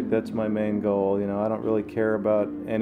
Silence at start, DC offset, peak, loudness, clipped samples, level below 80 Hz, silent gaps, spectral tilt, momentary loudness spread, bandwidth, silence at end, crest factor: 0 s; under 0.1%; -10 dBFS; -25 LUFS; under 0.1%; -58 dBFS; none; -9 dB/octave; 3 LU; 9.8 kHz; 0 s; 14 dB